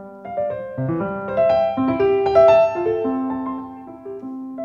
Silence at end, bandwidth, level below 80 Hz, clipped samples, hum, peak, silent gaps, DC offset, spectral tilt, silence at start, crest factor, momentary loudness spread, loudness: 0 s; 6.8 kHz; -50 dBFS; under 0.1%; none; -2 dBFS; none; under 0.1%; -8.5 dB/octave; 0 s; 16 dB; 18 LU; -19 LUFS